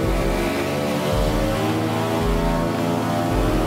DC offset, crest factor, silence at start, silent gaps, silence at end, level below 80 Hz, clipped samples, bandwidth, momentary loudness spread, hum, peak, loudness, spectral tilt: under 0.1%; 12 dB; 0 s; none; 0 s; -28 dBFS; under 0.1%; 16 kHz; 1 LU; none; -8 dBFS; -22 LUFS; -6 dB/octave